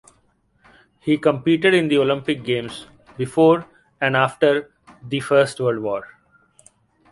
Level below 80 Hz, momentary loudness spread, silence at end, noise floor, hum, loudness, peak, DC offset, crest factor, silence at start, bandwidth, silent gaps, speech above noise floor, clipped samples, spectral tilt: -60 dBFS; 12 LU; 1.05 s; -62 dBFS; none; -19 LUFS; -2 dBFS; under 0.1%; 18 dB; 1.05 s; 11.5 kHz; none; 44 dB; under 0.1%; -6 dB/octave